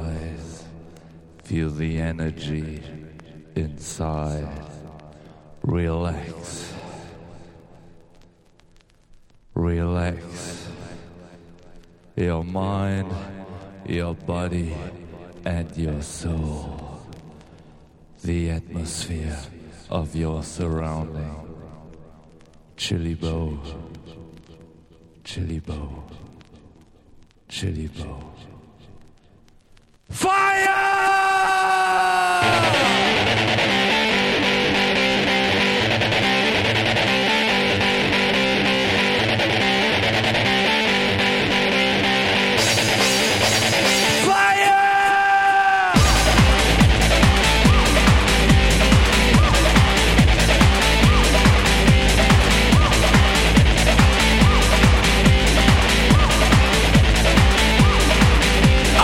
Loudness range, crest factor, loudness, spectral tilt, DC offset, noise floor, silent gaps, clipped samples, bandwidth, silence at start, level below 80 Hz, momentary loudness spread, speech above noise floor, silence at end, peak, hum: 16 LU; 18 dB; -17 LUFS; -4 dB/octave; under 0.1%; -54 dBFS; none; under 0.1%; 16.5 kHz; 0 s; -26 dBFS; 18 LU; 29 dB; 0 s; 0 dBFS; none